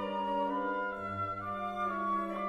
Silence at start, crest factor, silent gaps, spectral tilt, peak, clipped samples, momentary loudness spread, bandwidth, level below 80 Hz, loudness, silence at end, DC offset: 0 s; 12 dB; none; -7 dB/octave; -22 dBFS; under 0.1%; 4 LU; 12.5 kHz; -64 dBFS; -35 LUFS; 0 s; under 0.1%